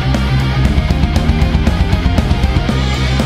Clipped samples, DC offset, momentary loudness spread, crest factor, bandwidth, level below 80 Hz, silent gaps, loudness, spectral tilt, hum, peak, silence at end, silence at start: under 0.1%; under 0.1%; 1 LU; 12 dB; 13 kHz; -16 dBFS; none; -14 LUFS; -6.5 dB/octave; none; 0 dBFS; 0 s; 0 s